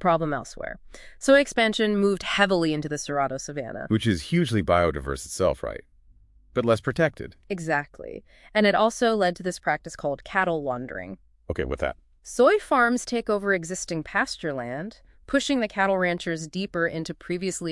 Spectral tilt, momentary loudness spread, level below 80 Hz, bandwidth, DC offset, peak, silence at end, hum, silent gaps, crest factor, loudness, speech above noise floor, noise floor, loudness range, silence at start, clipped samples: -5 dB/octave; 15 LU; -48 dBFS; 12 kHz; under 0.1%; -4 dBFS; 0 s; none; none; 20 dB; -25 LUFS; 31 dB; -55 dBFS; 3 LU; 0 s; under 0.1%